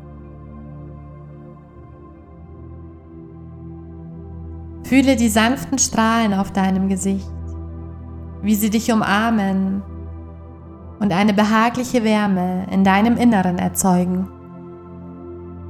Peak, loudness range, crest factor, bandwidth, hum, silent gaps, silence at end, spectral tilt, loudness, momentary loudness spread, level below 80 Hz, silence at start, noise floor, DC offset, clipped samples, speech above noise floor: 0 dBFS; 21 LU; 20 dB; 15 kHz; none; none; 0 s; -5 dB/octave; -18 LUFS; 23 LU; -40 dBFS; 0 s; -40 dBFS; under 0.1%; under 0.1%; 24 dB